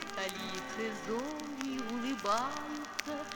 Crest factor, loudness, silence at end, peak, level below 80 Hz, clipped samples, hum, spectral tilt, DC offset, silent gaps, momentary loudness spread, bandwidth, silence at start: 26 dB; -37 LUFS; 0 s; -10 dBFS; -68 dBFS; under 0.1%; none; -3 dB/octave; under 0.1%; none; 7 LU; over 20 kHz; 0 s